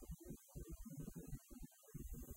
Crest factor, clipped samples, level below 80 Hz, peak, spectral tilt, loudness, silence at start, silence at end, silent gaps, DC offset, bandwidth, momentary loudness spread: 16 dB; under 0.1%; -58 dBFS; -38 dBFS; -6.5 dB/octave; -56 LUFS; 0 s; 0 s; none; under 0.1%; 16 kHz; 5 LU